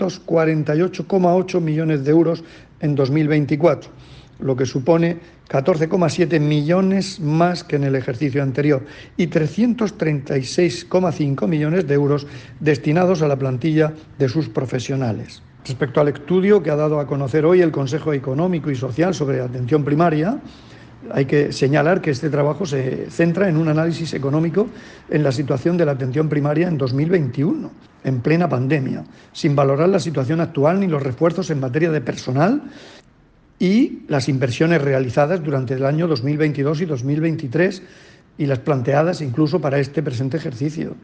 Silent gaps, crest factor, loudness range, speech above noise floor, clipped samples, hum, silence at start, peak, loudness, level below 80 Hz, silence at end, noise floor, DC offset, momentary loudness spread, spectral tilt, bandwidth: none; 16 dB; 2 LU; 34 dB; under 0.1%; none; 0 s; -4 dBFS; -19 LUFS; -54 dBFS; 0.05 s; -52 dBFS; under 0.1%; 7 LU; -7.5 dB/octave; 9 kHz